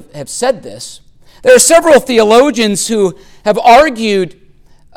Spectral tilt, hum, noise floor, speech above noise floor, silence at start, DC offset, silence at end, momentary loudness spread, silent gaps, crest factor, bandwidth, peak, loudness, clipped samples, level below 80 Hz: -3 dB/octave; none; -42 dBFS; 32 dB; 0.15 s; under 0.1%; 0.65 s; 17 LU; none; 10 dB; 17.5 kHz; 0 dBFS; -9 LUFS; under 0.1%; -42 dBFS